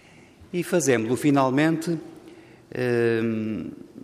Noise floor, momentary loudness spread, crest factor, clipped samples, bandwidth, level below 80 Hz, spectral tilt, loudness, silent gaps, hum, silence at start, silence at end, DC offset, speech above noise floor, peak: -50 dBFS; 13 LU; 16 dB; under 0.1%; 15.5 kHz; -64 dBFS; -5.5 dB/octave; -24 LUFS; none; none; 0.4 s; 0 s; under 0.1%; 27 dB; -8 dBFS